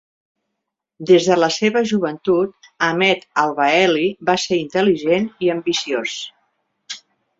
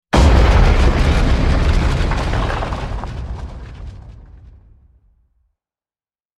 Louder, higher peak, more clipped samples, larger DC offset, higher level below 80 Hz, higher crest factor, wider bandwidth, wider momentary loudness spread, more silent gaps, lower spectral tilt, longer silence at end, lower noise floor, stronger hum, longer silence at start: about the same, -18 LUFS vs -17 LUFS; about the same, -2 dBFS vs 0 dBFS; neither; neither; second, -62 dBFS vs -18 dBFS; about the same, 16 dB vs 16 dB; second, 7.8 kHz vs 11 kHz; second, 15 LU vs 20 LU; neither; second, -4.5 dB/octave vs -6.5 dB/octave; second, 0.4 s vs 2.2 s; second, -79 dBFS vs under -90 dBFS; neither; first, 1 s vs 0.15 s